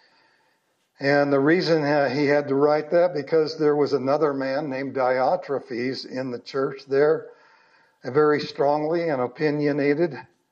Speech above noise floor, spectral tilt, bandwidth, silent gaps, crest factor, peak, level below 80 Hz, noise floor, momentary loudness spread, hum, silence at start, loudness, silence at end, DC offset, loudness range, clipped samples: 46 dB; -7 dB/octave; 7.2 kHz; none; 16 dB; -8 dBFS; -78 dBFS; -68 dBFS; 9 LU; none; 1 s; -23 LUFS; 0.3 s; under 0.1%; 4 LU; under 0.1%